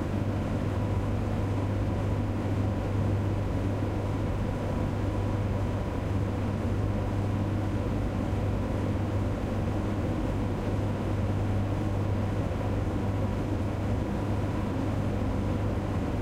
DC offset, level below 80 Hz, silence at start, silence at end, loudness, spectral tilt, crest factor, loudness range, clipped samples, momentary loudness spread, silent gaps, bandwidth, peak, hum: under 0.1%; -38 dBFS; 0 s; 0 s; -30 LUFS; -8 dB/octave; 12 dB; 1 LU; under 0.1%; 1 LU; none; 11 kHz; -16 dBFS; none